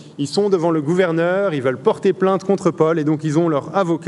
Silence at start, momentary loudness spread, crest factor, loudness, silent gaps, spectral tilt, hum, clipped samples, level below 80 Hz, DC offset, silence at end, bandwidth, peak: 0 s; 3 LU; 16 dB; -18 LUFS; none; -7 dB/octave; none; under 0.1%; -66 dBFS; under 0.1%; 0 s; 11.5 kHz; -2 dBFS